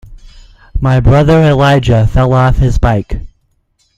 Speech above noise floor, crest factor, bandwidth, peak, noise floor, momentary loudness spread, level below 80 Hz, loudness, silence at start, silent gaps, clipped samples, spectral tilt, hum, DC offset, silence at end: 49 dB; 10 dB; 9.2 kHz; 0 dBFS; -58 dBFS; 11 LU; -20 dBFS; -10 LUFS; 0.1 s; none; under 0.1%; -8 dB/octave; none; under 0.1%; 0.7 s